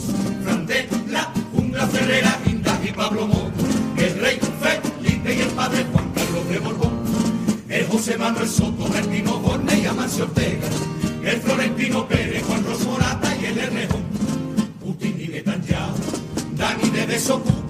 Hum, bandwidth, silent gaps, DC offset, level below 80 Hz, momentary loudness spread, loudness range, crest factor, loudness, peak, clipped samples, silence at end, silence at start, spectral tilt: none; 15.5 kHz; none; under 0.1%; -42 dBFS; 5 LU; 3 LU; 20 dB; -21 LUFS; -2 dBFS; under 0.1%; 0 s; 0 s; -5 dB/octave